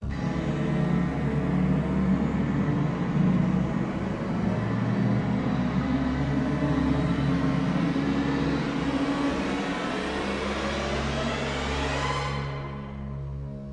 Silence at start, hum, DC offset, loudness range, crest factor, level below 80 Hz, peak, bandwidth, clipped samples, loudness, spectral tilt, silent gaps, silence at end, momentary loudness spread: 0 s; none; under 0.1%; 3 LU; 14 dB; -40 dBFS; -12 dBFS; 10.5 kHz; under 0.1%; -27 LUFS; -7 dB/octave; none; 0 s; 5 LU